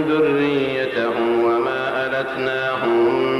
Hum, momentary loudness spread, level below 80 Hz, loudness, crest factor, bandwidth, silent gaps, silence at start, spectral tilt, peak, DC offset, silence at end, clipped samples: none; 4 LU; -56 dBFS; -19 LUFS; 10 dB; 12 kHz; none; 0 s; -6.5 dB/octave; -8 dBFS; under 0.1%; 0 s; under 0.1%